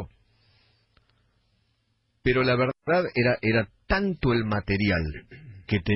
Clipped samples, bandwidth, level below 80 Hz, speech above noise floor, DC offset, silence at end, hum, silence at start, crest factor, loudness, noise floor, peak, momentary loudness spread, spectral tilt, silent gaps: under 0.1%; 5.8 kHz; -44 dBFS; 47 dB; under 0.1%; 0 s; none; 0 s; 16 dB; -25 LUFS; -71 dBFS; -10 dBFS; 15 LU; -10 dB/octave; none